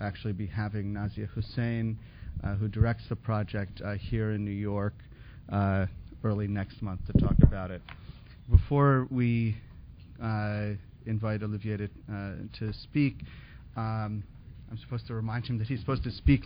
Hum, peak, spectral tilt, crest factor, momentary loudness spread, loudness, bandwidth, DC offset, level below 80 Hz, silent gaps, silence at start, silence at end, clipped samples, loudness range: none; -6 dBFS; -12 dB/octave; 24 dB; 19 LU; -31 LUFS; 5.2 kHz; under 0.1%; -38 dBFS; none; 0 s; 0 s; under 0.1%; 8 LU